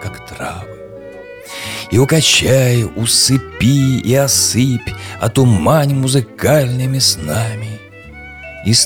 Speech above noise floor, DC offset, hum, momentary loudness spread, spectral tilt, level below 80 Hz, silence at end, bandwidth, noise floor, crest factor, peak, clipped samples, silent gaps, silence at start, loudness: 21 dB; 0.1%; none; 21 LU; -4 dB/octave; -38 dBFS; 0 s; 17.5 kHz; -35 dBFS; 14 dB; 0 dBFS; under 0.1%; none; 0 s; -13 LUFS